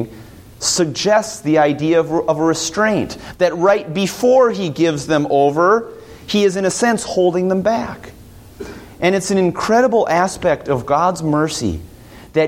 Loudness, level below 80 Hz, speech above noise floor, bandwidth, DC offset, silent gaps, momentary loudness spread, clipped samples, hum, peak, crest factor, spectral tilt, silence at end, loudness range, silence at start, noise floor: -16 LUFS; -46 dBFS; 24 dB; 16.5 kHz; under 0.1%; none; 10 LU; under 0.1%; none; -2 dBFS; 14 dB; -4.5 dB/octave; 0 s; 2 LU; 0 s; -40 dBFS